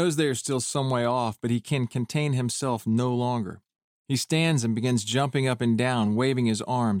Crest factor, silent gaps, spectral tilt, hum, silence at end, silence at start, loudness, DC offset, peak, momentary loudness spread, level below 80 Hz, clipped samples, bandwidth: 14 dB; 3.84-4.05 s; -5.5 dB/octave; none; 0 s; 0 s; -26 LUFS; under 0.1%; -10 dBFS; 4 LU; -64 dBFS; under 0.1%; 16 kHz